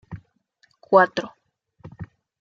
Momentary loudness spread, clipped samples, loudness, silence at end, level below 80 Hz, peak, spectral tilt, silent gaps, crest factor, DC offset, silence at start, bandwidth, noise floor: 25 LU; under 0.1%; -19 LUFS; 0.35 s; -60 dBFS; -2 dBFS; -6 dB/octave; none; 22 dB; under 0.1%; 0.1 s; 7.2 kHz; -64 dBFS